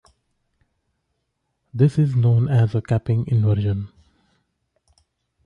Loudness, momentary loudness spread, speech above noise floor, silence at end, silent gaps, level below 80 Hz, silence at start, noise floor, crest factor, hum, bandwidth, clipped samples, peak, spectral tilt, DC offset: -20 LUFS; 10 LU; 57 dB; 1.6 s; none; -46 dBFS; 1.75 s; -75 dBFS; 16 dB; none; 5.4 kHz; under 0.1%; -6 dBFS; -9.5 dB/octave; under 0.1%